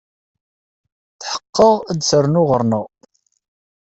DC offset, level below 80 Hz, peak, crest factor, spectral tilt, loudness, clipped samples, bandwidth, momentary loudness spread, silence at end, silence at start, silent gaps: under 0.1%; -52 dBFS; -2 dBFS; 18 dB; -5.5 dB/octave; -16 LUFS; under 0.1%; 8.2 kHz; 13 LU; 1 s; 1.2 s; 1.49-1.53 s